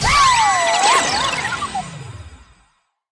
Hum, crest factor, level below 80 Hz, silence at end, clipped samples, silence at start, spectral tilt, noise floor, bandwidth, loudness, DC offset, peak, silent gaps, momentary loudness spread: none; 14 dB; -38 dBFS; 0.75 s; under 0.1%; 0 s; -1.5 dB/octave; -62 dBFS; 10.5 kHz; -15 LUFS; under 0.1%; -4 dBFS; none; 20 LU